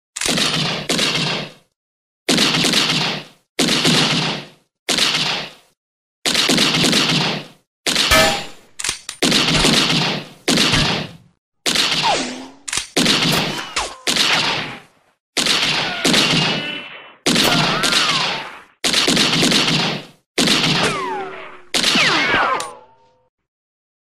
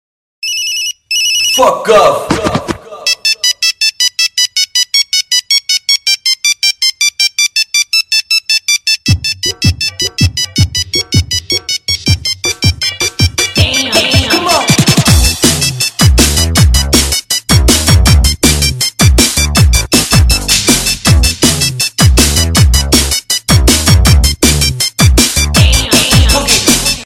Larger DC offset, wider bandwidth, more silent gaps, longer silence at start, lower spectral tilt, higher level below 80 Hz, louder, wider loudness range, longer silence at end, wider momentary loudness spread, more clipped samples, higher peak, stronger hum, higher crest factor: neither; second, 15.5 kHz vs over 20 kHz; first, 1.76-2.26 s, 3.49-3.55 s, 4.79-4.86 s, 5.77-6.22 s, 7.67-7.83 s, 11.38-11.52 s, 15.20-15.33 s, 20.26-20.34 s vs none; second, 0.15 s vs 0.4 s; about the same, -2.5 dB/octave vs -3 dB/octave; second, -42 dBFS vs -18 dBFS; second, -16 LUFS vs -9 LUFS; about the same, 2 LU vs 3 LU; first, 1.2 s vs 0 s; first, 13 LU vs 5 LU; second, under 0.1% vs 0.7%; about the same, 0 dBFS vs 0 dBFS; neither; first, 18 dB vs 10 dB